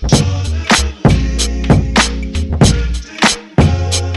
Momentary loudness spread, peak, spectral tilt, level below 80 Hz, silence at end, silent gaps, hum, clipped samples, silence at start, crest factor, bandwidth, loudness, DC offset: 7 LU; 0 dBFS; -4.5 dB/octave; -20 dBFS; 0 s; none; none; under 0.1%; 0 s; 12 dB; 12 kHz; -13 LUFS; under 0.1%